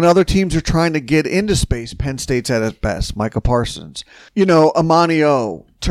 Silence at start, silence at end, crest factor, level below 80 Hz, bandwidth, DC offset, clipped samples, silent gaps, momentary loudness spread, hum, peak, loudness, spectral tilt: 0 s; 0 s; 14 dB; -30 dBFS; 15 kHz; under 0.1%; under 0.1%; none; 12 LU; none; -2 dBFS; -16 LUFS; -5.5 dB/octave